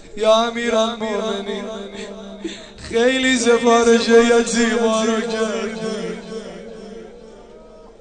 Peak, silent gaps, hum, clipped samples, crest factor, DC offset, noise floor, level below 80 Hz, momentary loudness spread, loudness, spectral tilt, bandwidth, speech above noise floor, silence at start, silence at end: 0 dBFS; none; none; under 0.1%; 18 dB; under 0.1%; -42 dBFS; -48 dBFS; 20 LU; -17 LUFS; -3 dB/octave; 9.6 kHz; 25 dB; 0 s; 0.1 s